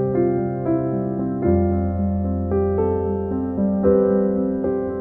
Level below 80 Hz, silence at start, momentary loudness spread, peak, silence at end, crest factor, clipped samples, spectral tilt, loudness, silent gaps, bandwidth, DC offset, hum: -38 dBFS; 0 s; 6 LU; -6 dBFS; 0 s; 14 dB; under 0.1%; -13.5 dB/octave; -21 LUFS; none; 2.5 kHz; under 0.1%; none